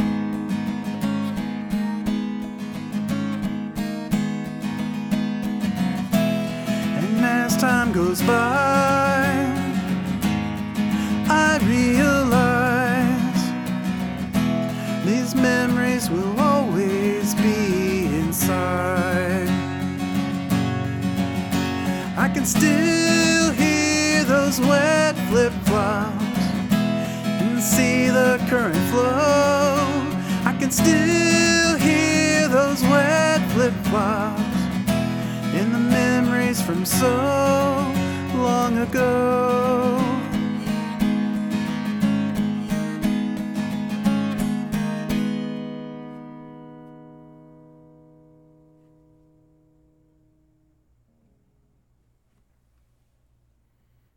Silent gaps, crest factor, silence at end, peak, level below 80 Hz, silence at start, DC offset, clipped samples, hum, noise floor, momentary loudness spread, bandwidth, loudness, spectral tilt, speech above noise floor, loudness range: none; 20 dB; 6.95 s; -2 dBFS; -46 dBFS; 0 s; under 0.1%; under 0.1%; none; -65 dBFS; 9 LU; 19 kHz; -21 LUFS; -5 dB/octave; 47 dB; 8 LU